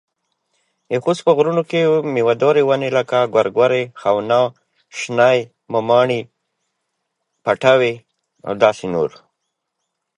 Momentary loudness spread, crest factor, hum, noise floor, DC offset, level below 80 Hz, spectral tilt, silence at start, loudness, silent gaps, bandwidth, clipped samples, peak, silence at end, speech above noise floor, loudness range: 10 LU; 18 dB; none; -76 dBFS; under 0.1%; -62 dBFS; -5.5 dB/octave; 0.9 s; -17 LUFS; none; 10.5 kHz; under 0.1%; 0 dBFS; 1.1 s; 60 dB; 4 LU